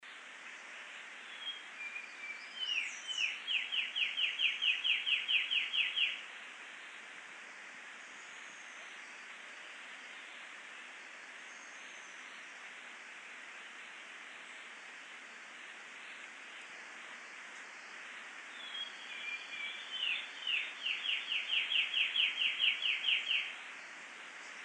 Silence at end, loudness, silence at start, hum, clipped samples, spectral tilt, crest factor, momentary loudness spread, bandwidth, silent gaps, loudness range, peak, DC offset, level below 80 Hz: 0 s; -34 LUFS; 0 s; none; under 0.1%; 2 dB/octave; 22 dB; 18 LU; 11 kHz; none; 16 LU; -18 dBFS; under 0.1%; under -90 dBFS